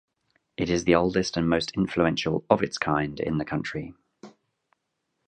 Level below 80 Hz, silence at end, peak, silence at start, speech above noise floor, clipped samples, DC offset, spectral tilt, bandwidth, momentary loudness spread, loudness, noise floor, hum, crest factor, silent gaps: -50 dBFS; 1 s; -4 dBFS; 0.6 s; 54 dB; under 0.1%; under 0.1%; -5.5 dB/octave; 9.2 kHz; 11 LU; -25 LUFS; -79 dBFS; none; 24 dB; none